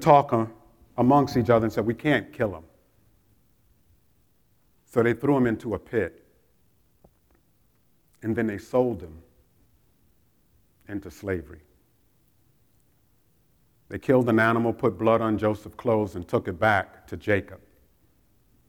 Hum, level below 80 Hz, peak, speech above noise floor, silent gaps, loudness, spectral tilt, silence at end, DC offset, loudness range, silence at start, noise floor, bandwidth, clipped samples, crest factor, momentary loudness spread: none; -58 dBFS; -4 dBFS; 43 dB; none; -25 LUFS; -7.5 dB/octave; 1.1 s; under 0.1%; 15 LU; 0 s; -66 dBFS; 18.5 kHz; under 0.1%; 24 dB; 16 LU